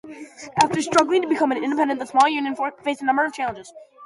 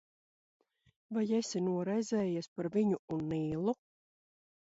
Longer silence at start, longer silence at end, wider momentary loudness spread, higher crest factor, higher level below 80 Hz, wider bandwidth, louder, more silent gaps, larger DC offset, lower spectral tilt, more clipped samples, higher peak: second, 0.05 s vs 1.1 s; second, 0 s vs 1.05 s; first, 11 LU vs 4 LU; about the same, 20 dB vs 16 dB; first, -62 dBFS vs -70 dBFS; first, 11.5 kHz vs 8 kHz; first, -21 LUFS vs -35 LUFS; second, none vs 2.48-2.56 s, 2.99-3.08 s; neither; second, -4 dB/octave vs -6.5 dB/octave; neither; first, -2 dBFS vs -20 dBFS